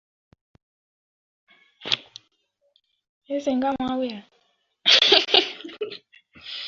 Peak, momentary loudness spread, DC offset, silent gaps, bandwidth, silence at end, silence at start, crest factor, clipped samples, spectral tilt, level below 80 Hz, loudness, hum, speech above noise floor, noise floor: 0 dBFS; 23 LU; under 0.1%; 3.09-3.22 s; 7.6 kHz; 0 s; 1.8 s; 26 dB; under 0.1%; -2 dB/octave; -66 dBFS; -20 LUFS; none; 45 dB; -70 dBFS